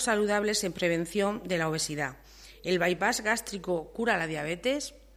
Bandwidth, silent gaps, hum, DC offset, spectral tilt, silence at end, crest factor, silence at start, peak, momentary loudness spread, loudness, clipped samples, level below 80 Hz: 16 kHz; none; none; under 0.1%; -3.5 dB/octave; 0.2 s; 18 dB; 0 s; -12 dBFS; 7 LU; -29 LUFS; under 0.1%; -56 dBFS